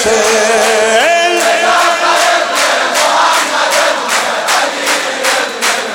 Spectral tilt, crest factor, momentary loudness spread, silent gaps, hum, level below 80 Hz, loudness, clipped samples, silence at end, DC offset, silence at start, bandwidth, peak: 0 dB/octave; 10 dB; 3 LU; none; none; -54 dBFS; -10 LUFS; under 0.1%; 0 s; under 0.1%; 0 s; 18.5 kHz; 0 dBFS